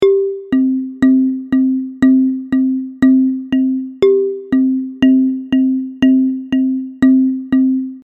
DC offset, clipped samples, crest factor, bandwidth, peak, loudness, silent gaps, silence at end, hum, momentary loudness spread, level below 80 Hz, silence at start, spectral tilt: under 0.1%; under 0.1%; 12 dB; 4.1 kHz; 0 dBFS; -14 LUFS; none; 0.05 s; none; 5 LU; -50 dBFS; 0 s; -7.5 dB/octave